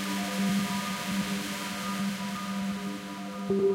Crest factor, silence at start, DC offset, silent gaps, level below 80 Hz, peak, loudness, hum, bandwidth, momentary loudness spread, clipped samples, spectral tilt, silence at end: 14 dB; 0 s; under 0.1%; none; -64 dBFS; -16 dBFS; -31 LUFS; none; 16 kHz; 8 LU; under 0.1%; -4.5 dB/octave; 0 s